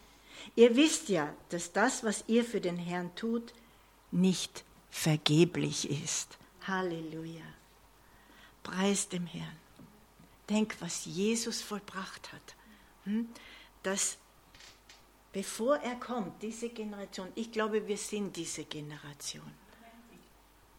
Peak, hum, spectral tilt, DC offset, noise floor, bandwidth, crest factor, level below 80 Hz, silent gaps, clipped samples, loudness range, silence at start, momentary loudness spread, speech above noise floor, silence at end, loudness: -8 dBFS; none; -4 dB/octave; under 0.1%; -62 dBFS; 17 kHz; 26 dB; -68 dBFS; none; under 0.1%; 7 LU; 0.3 s; 21 LU; 29 dB; 0.6 s; -33 LUFS